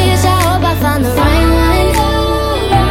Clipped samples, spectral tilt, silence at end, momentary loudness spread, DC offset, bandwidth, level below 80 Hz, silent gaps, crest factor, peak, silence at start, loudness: under 0.1%; -5.5 dB/octave; 0 s; 3 LU; under 0.1%; 17 kHz; -18 dBFS; none; 10 dB; 0 dBFS; 0 s; -12 LUFS